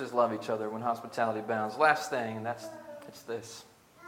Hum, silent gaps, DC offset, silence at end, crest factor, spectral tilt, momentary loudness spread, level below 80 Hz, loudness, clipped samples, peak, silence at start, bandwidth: none; none; under 0.1%; 0 s; 22 dB; -4.5 dB/octave; 20 LU; -80 dBFS; -32 LUFS; under 0.1%; -10 dBFS; 0 s; 17.5 kHz